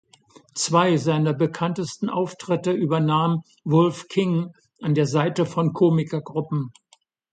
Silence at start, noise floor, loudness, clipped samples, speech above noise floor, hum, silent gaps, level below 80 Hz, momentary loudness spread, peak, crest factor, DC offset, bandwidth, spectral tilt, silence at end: 0.55 s; -61 dBFS; -22 LUFS; under 0.1%; 40 dB; none; none; -66 dBFS; 8 LU; -4 dBFS; 18 dB; under 0.1%; 9.4 kHz; -6.5 dB/octave; 0.6 s